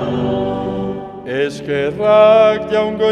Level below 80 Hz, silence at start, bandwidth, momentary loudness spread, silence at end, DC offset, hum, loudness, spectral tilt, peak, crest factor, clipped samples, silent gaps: -44 dBFS; 0 s; 9.6 kHz; 14 LU; 0 s; under 0.1%; none; -15 LUFS; -6.5 dB/octave; 0 dBFS; 14 dB; under 0.1%; none